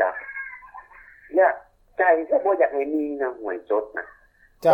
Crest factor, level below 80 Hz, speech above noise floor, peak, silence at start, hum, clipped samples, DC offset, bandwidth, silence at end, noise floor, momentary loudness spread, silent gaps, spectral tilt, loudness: 18 dB; -62 dBFS; 25 dB; -4 dBFS; 0 s; none; under 0.1%; under 0.1%; 12 kHz; 0 s; -49 dBFS; 18 LU; none; -7 dB/octave; -23 LUFS